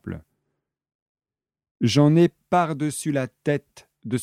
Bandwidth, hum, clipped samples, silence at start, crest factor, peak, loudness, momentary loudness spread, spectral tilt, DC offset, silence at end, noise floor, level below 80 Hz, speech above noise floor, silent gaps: 14 kHz; none; under 0.1%; 0.05 s; 18 dB; -6 dBFS; -22 LUFS; 17 LU; -6 dB/octave; under 0.1%; 0 s; -79 dBFS; -60 dBFS; 58 dB; 0.95-1.15 s, 1.71-1.75 s